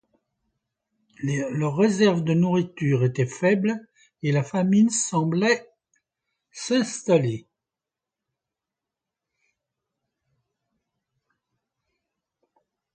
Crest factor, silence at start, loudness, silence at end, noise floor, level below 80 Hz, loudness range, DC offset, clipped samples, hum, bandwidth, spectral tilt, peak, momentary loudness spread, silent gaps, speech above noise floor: 18 dB; 1.2 s; -23 LUFS; 5.55 s; -88 dBFS; -68 dBFS; 6 LU; under 0.1%; under 0.1%; none; 9.4 kHz; -5.5 dB/octave; -8 dBFS; 9 LU; none; 66 dB